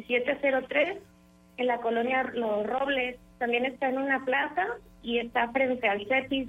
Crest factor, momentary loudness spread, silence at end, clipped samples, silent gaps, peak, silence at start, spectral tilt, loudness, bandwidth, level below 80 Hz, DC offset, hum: 18 dB; 6 LU; 0 s; under 0.1%; none; -12 dBFS; 0 s; -5.5 dB/octave; -28 LUFS; 8.4 kHz; -62 dBFS; under 0.1%; none